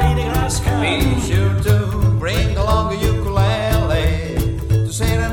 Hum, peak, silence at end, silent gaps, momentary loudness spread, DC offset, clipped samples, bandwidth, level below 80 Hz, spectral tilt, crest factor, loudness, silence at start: none; -2 dBFS; 0 s; none; 2 LU; under 0.1%; under 0.1%; 18 kHz; -22 dBFS; -5.5 dB/octave; 14 dB; -18 LUFS; 0 s